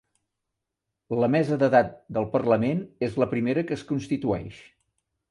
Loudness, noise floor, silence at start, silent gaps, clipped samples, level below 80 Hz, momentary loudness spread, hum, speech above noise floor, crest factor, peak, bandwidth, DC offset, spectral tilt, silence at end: -25 LUFS; -84 dBFS; 1.1 s; none; under 0.1%; -56 dBFS; 9 LU; none; 60 dB; 20 dB; -6 dBFS; 11 kHz; under 0.1%; -8 dB/octave; 0.7 s